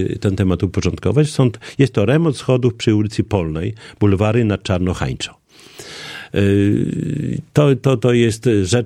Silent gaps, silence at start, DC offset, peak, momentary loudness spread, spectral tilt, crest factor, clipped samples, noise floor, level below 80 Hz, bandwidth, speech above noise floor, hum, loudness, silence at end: none; 0 s; under 0.1%; 0 dBFS; 10 LU; -6.5 dB/octave; 16 dB; under 0.1%; -40 dBFS; -40 dBFS; 12.5 kHz; 24 dB; none; -17 LUFS; 0 s